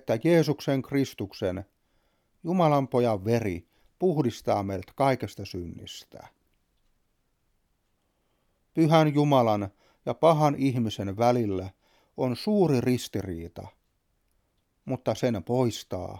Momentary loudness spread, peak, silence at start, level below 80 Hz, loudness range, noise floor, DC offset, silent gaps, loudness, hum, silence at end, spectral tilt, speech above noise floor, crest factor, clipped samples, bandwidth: 16 LU; -6 dBFS; 0.05 s; -60 dBFS; 8 LU; -73 dBFS; under 0.1%; none; -26 LUFS; none; 0 s; -7 dB/octave; 47 dB; 20 dB; under 0.1%; 16.5 kHz